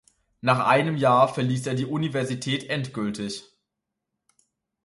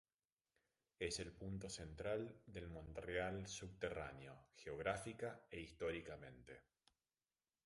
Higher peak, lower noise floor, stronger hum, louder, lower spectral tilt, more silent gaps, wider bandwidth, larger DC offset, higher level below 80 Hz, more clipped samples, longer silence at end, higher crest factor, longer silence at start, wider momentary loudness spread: first, -6 dBFS vs -28 dBFS; second, -83 dBFS vs under -90 dBFS; neither; first, -24 LUFS vs -49 LUFS; first, -6 dB/octave vs -4.5 dB/octave; neither; about the same, 11.5 kHz vs 11.5 kHz; neither; about the same, -64 dBFS vs -66 dBFS; neither; first, 1.45 s vs 1.05 s; about the same, 20 dB vs 22 dB; second, 0.45 s vs 1 s; second, 10 LU vs 13 LU